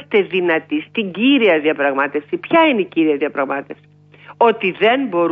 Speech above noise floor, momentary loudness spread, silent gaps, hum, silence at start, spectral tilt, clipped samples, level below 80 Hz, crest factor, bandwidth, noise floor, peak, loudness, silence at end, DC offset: 27 dB; 9 LU; none; 50 Hz at -50 dBFS; 0 s; -7.5 dB/octave; under 0.1%; -66 dBFS; 14 dB; 4.7 kHz; -43 dBFS; -2 dBFS; -16 LUFS; 0 s; under 0.1%